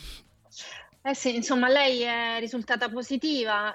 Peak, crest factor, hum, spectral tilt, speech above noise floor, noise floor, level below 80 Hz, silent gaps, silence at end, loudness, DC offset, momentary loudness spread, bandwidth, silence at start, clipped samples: -12 dBFS; 16 dB; none; -2.5 dB/octave; 22 dB; -48 dBFS; -56 dBFS; none; 0 s; -26 LUFS; under 0.1%; 20 LU; 13 kHz; 0 s; under 0.1%